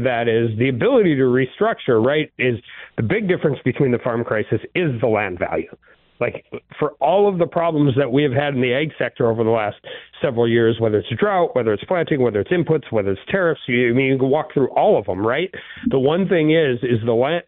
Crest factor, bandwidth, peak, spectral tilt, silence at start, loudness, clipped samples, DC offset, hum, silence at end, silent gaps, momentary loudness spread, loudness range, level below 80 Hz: 12 dB; 4.1 kHz; -6 dBFS; -11.5 dB/octave; 0 s; -19 LUFS; under 0.1%; under 0.1%; none; 0.05 s; none; 9 LU; 3 LU; -54 dBFS